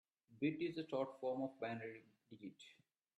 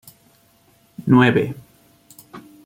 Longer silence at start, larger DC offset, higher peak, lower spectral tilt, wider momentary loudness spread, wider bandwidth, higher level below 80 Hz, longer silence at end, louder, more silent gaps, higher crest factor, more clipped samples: second, 0.3 s vs 1 s; neither; second, -28 dBFS vs -2 dBFS; about the same, -7 dB/octave vs -7.5 dB/octave; second, 20 LU vs 27 LU; second, 10 kHz vs 16 kHz; second, -88 dBFS vs -58 dBFS; first, 0.45 s vs 0.25 s; second, -44 LUFS vs -17 LUFS; neither; about the same, 18 dB vs 20 dB; neither